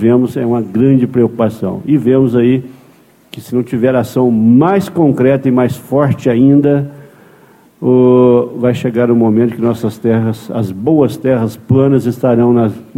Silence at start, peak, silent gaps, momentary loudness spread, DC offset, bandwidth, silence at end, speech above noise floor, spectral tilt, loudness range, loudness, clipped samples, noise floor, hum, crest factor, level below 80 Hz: 0 s; 0 dBFS; none; 8 LU; under 0.1%; 15.5 kHz; 0.15 s; 34 dB; -9 dB/octave; 2 LU; -12 LUFS; under 0.1%; -45 dBFS; none; 12 dB; -48 dBFS